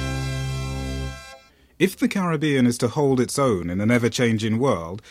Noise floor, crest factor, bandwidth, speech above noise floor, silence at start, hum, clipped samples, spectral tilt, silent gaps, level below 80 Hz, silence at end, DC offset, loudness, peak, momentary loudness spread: -48 dBFS; 16 dB; 16 kHz; 27 dB; 0 s; none; under 0.1%; -5.5 dB/octave; none; -40 dBFS; 0 s; under 0.1%; -22 LUFS; -6 dBFS; 9 LU